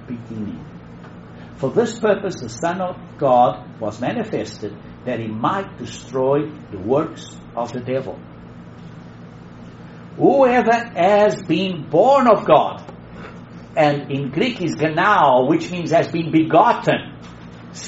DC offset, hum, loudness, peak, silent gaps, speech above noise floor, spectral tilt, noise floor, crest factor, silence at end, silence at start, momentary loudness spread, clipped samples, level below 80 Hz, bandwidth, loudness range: under 0.1%; none; -18 LUFS; 0 dBFS; none; 20 dB; -5 dB/octave; -38 dBFS; 18 dB; 0 s; 0 s; 24 LU; under 0.1%; -52 dBFS; 8 kHz; 8 LU